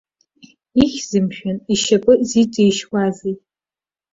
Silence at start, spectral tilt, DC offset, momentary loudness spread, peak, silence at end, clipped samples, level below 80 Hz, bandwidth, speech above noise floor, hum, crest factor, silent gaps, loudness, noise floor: 0.75 s; -5 dB/octave; under 0.1%; 12 LU; -2 dBFS; 0.75 s; under 0.1%; -48 dBFS; 7.8 kHz; over 74 dB; none; 16 dB; none; -17 LUFS; under -90 dBFS